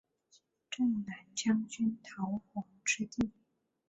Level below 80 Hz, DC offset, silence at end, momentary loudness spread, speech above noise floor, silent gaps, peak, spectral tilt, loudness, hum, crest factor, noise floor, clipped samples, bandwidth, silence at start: -68 dBFS; under 0.1%; 0.6 s; 8 LU; 35 dB; none; -20 dBFS; -3.5 dB/octave; -36 LUFS; none; 18 dB; -70 dBFS; under 0.1%; 8.2 kHz; 0.7 s